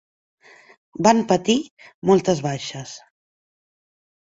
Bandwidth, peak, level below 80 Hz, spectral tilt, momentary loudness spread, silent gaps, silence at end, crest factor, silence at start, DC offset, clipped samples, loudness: 8 kHz; -2 dBFS; -60 dBFS; -5 dB/octave; 21 LU; 1.71-1.77 s, 1.94-2.02 s; 1.25 s; 22 dB; 1 s; under 0.1%; under 0.1%; -20 LUFS